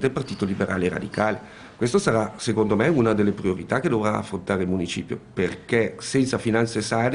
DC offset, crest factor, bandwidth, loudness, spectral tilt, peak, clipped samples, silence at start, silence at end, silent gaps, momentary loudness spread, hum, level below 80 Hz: under 0.1%; 18 dB; 10.5 kHz; -24 LUFS; -6 dB/octave; -4 dBFS; under 0.1%; 0 s; 0 s; none; 7 LU; none; -54 dBFS